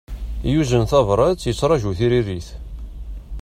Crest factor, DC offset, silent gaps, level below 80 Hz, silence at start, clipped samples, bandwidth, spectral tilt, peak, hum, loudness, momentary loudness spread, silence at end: 16 dB; under 0.1%; none; -32 dBFS; 0.1 s; under 0.1%; 15 kHz; -6.5 dB/octave; -4 dBFS; none; -19 LUFS; 19 LU; 0 s